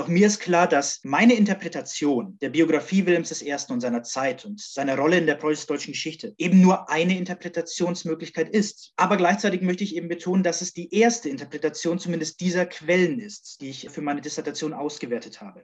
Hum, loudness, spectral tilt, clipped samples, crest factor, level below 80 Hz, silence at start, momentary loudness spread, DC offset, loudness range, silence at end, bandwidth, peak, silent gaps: none; -23 LUFS; -5 dB/octave; under 0.1%; 18 dB; -72 dBFS; 0 s; 12 LU; under 0.1%; 4 LU; 0.05 s; 8.4 kHz; -6 dBFS; none